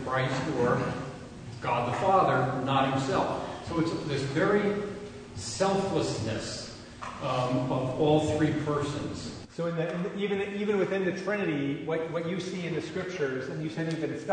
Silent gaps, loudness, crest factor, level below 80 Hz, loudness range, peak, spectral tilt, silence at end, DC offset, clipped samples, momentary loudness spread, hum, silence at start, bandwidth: none; -29 LUFS; 18 dB; -56 dBFS; 3 LU; -12 dBFS; -6 dB/octave; 0 s; under 0.1%; under 0.1%; 11 LU; none; 0 s; 9.6 kHz